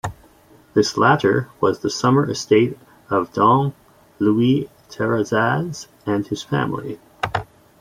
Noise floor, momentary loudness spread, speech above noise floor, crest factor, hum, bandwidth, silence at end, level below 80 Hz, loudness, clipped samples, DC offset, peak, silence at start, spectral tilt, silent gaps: -51 dBFS; 12 LU; 32 dB; 18 dB; none; 15.5 kHz; 0.35 s; -54 dBFS; -20 LUFS; under 0.1%; under 0.1%; -2 dBFS; 0.05 s; -6 dB/octave; none